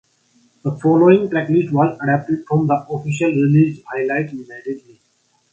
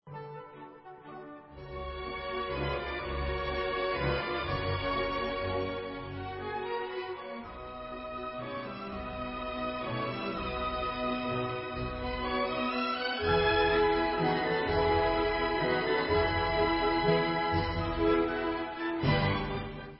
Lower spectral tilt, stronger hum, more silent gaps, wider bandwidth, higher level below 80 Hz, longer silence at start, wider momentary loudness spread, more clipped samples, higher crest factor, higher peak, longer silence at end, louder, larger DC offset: about the same, -8.5 dB/octave vs -9.5 dB/octave; neither; neither; first, 8.4 kHz vs 5.8 kHz; second, -60 dBFS vs -44 dBFS; first, 0.65 s vs 0.05 s; about the same, 16 LU vs 14 LU; neither; about the same, 18 dB vs 16 dB; first, 0 dBFS vs -14 dBFS; first, 0.75 s vs 0 s; first, -17 LUFS vs -31 LUFS; neither